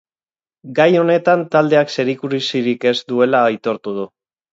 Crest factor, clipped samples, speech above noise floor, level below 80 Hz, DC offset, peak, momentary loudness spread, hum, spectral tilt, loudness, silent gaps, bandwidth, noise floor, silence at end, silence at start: 16 dB; under 0.1%; over 74 dB; -68 dBFS; under 0.1%; 0 dBFS; 10 LU; none; -6 dB/octave; -16 LUFS; none; 7.8 kHz; under -90 dBFS; 0.45 s; 0.65 s